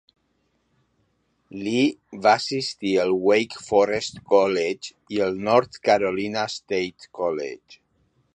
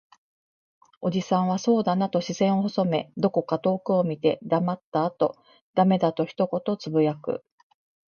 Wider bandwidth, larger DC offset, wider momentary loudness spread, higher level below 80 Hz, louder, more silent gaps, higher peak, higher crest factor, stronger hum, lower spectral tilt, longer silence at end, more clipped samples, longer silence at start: first, 10 kHz vs 7 kHz; neither; first, 11 LU vs 6 LU; first, -62 dBFS vs -70 dBFS; about the same, -23 LUFS vs -25 LUFS; second, none vs 4.84-4.92 s, 5.61-5.74 s; about the same, -4 dBFS vs -6 dBFS; about the same, 20 dB vs 18 dB; neither; second, -4.5 dB/octave vs -7 dB/octave; about the same, 0.6 s vs 0.7 s; neither; first, 1.5 s vs 1 s